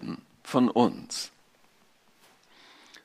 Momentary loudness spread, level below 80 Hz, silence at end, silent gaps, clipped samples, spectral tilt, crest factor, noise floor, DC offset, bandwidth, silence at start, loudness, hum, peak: 17 LU; -74 dBFS; 1.75 s; none; under 0.1%; -5 dB/octave; 24 dB; -63 dBFS; under 0.1%; 14.5 kHz; 0 s; -28 LUFS; none; -8 dBFS